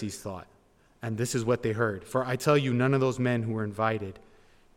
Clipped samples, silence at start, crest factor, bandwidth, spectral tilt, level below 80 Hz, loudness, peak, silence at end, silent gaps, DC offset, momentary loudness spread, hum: under 0.1%; 0 s; 18 dB; 16.5 kHz; -6 dB/octave; -60 dBFS; -28 LUFS; -12 dBFS; 0.6 s; none; under 0.1%; 14 LU; none